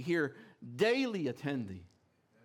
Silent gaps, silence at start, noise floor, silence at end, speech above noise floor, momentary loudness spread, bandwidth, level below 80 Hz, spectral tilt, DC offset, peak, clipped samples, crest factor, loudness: none; 0 s; -70 dBFS; 0.6 s; 36 dB; 19 LU; 17 kHz; -80 dBFS; -6 dB/octave; under 0.1%; -18 dBFS; under 0.1%; 18 dB; -34 LUFS